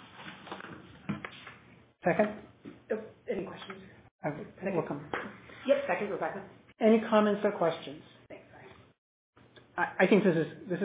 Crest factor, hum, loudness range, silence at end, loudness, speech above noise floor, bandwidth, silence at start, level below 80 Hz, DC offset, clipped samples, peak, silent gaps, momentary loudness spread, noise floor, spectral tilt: 22 dB; none; 7 LU; 0 s; -31 LUFS; 29 dB; 4 kHz; 0 s; -68 dBFS; under 0.1%; under 0.1%; -12 dBFS; 4.11-4.19 s, 8.98-9.33 s; 23 LU; -58 dBFS; -5 dB/octave